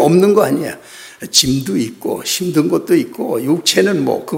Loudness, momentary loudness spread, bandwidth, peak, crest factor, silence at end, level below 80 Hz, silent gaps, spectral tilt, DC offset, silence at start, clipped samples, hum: -15 LUFS; 10 LU; 16.5 kHz; 0 dBFS; 14 dB; 0 s; -48 dBFS; none; -4 dB/octave; under 0.1%; 0 s; under 0.1%; none